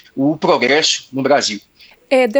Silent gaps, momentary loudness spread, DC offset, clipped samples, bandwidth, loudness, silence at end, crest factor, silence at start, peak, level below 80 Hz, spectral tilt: none; 7 LU; under 0.1%; under 0.1%; over 20 kHz; -15 LUFS; 0 s; 14 dB; 0.15 s; 0 dBFS; -64 dBFS; -3 dB/octave